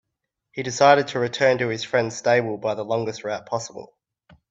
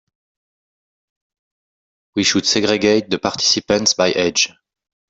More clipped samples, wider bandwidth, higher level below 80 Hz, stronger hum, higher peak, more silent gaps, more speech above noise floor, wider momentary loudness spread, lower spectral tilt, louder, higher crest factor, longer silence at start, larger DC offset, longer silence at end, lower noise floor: neither; about the same, 8 kHz vs 8 kHz; second, -64 dBFS vs -56 dBFS; neither; about the same, -2 dBFS vs -2 dBFS; neither; second, 59 dB vs over 73 dB; first, 15 LU vs 4 LU; first, -4.5 dB/octave vs -2.5 dB/octave; second, -22 LUFS vs -16 LUFS; about the same, 20 dB vs 18 dB; second, 0.55 s vs 2.15 s; neither; about the same, 0.65 s vs 0.65 s; second, -81 dBFS vs under -90 dBFS